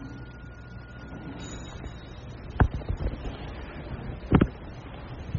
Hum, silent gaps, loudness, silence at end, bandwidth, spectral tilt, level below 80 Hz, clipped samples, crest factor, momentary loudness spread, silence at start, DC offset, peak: none; none; -32 LUFS; 0 s; 7.2 kHz; -7 dB/octave; -38 dBFS; under 0.1%; 26 dB; 18 LU; 0 s; under 0.1%; -4 dBFS